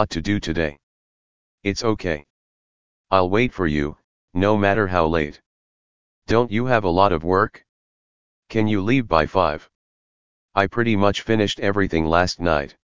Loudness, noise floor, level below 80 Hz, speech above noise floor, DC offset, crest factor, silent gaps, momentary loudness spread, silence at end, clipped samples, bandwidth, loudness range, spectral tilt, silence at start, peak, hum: -21 LUFS; under -90 dBFS; -40 dBFS; over 70 dB; 2%; 20 dB; 0.83-1.58 s, 2.30-3.04 s, 4.04-4.28 s, 5.46-6.22 s, 7.69-8.43 s, 9.75-10.49 s; 8 LU; 0.1 s; under 0.1%; 7.6 kHz; 3 LU; -6 dB/octave; 0 s; 0 dBFS; none